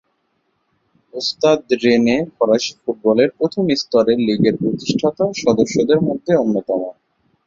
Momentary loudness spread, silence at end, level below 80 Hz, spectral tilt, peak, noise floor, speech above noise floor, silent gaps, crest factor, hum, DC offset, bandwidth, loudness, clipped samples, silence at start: 8 LU; 0.55 s; -54 dBFS; -5.5 dB/octave; -2 dBFS; -67 dBFS; 51 dB; none; 16 dB; none; under 0.1%; 7.6 kHz; -17 LUFS; under 0.1%; 1.15 s